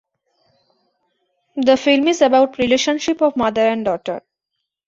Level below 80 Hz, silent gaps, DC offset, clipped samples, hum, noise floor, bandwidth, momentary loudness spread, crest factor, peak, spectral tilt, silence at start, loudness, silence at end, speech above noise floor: -56 dBFS; none; under 0.1%; under 0.1%; none; -78 dBFS; 7.8 kHz; 11 LU; 16 dB; -2 dBFS; -3.5 dB/octave; 1.55 s; -16 LUFS; 0.7 s; 62 dB